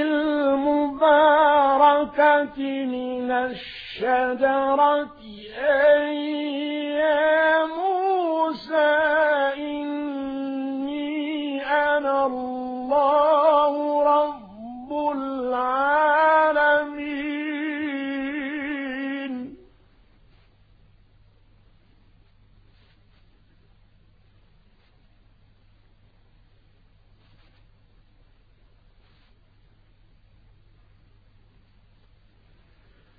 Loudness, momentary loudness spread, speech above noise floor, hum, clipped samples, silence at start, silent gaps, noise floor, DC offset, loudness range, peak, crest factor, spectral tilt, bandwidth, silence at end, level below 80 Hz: -22 LUFS; 12 LU; 36 dB; none; under 0.1%; 0 s; none; -57 dBFS; under 0.1%; 10 LU; -4 dBFS; 20 dB; -7 dB/octave; 5 kHz; 13.65 s; -58 dBFS